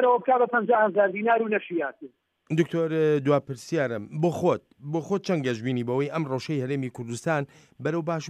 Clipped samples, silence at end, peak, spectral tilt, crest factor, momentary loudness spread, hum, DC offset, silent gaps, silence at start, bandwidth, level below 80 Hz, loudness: under 0.1%; 0 s; -10 dBFS; -6.5 dB/octave; 16 dB; 9 LU; none; under 0.1%; none; 0 s; 12.5 kHz; -72 dBFS; -26 LUFS